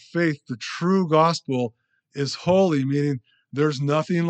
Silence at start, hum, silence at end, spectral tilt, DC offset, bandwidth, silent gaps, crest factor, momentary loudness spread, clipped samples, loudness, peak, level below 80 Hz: 0.15 s; none; 0 s; -6.5 dB/octave; under 0.1%; 8.8 kHz; none; 16 dB; 12 LU; under 0.1%; -23 LUFS; -6 dBFS; -64 dBFS